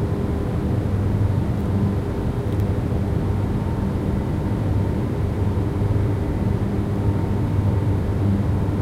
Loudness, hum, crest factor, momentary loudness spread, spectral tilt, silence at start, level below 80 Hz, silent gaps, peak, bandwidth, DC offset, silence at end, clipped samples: -22 LUFS; none; 12 dB; 3 LU; -9 dB/octave; 0 s; -30 dBFS; none; -8 dBFS; 11.5 kHz; under 0.1%; 0 s; under 0.1%